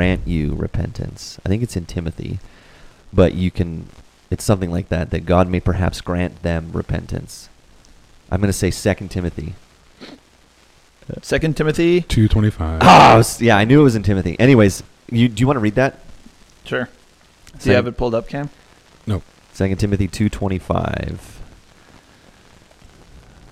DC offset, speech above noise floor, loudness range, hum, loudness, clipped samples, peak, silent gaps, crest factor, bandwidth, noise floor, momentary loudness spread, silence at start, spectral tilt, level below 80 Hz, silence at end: under 0.1%; 35 dB; 12 LU; none; -17 LUFS; under 0.1%; 0 dBFS; none; 18 dB; 15 kHz; -52 dBFS; 17 LU; 0 s; -6 dB/octave; -34 dBFS; 2.05 s